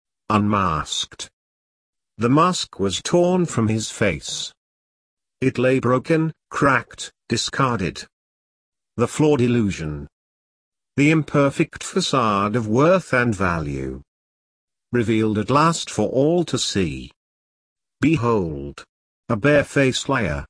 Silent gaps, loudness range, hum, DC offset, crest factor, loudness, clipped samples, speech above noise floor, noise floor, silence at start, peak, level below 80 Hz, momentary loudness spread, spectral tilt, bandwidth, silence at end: 1.33-1.93 s, 4.57-5.17 s, 8.13-8.72 s, 10.13-10.72 s, 14.08-14.68 s, 17.16-17.76 s, 18.89-19.23 s; 3 LU; none; under 0.1%; 18 dB; -20 LUFS; under 0.1%; over 70 dB; under -90 dBFS; 0.3 s; -2 dBFS; -46 dBFS; 12 LU; -5.5 dB/octave; 11 kHz; 0.05 s